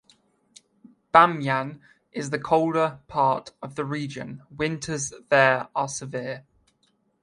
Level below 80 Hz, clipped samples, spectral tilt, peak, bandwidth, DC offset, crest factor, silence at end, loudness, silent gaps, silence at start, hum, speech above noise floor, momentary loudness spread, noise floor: -62 dBFS; under 0.1%; -4.5 dB/octave; 0 dBFS; 11.5 kHz; under 0.1%; 26 dB; 0.8 s; -24 LUFS; none; 1.15 s; none; 44 dB; 17 LU; -68 dBFS